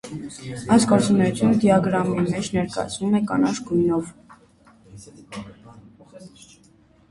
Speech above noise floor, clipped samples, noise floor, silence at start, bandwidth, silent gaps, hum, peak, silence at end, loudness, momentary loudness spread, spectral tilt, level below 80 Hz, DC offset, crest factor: 34 dB; under 0.1%; -55 dBFS; 0.05 s; 11.5 kHz; none; none; -2 dBFS; 0.8 s; -20 LUFS; 20 LU; -6 dB/octave; -52 dBFS; under 0.1%; 20 dB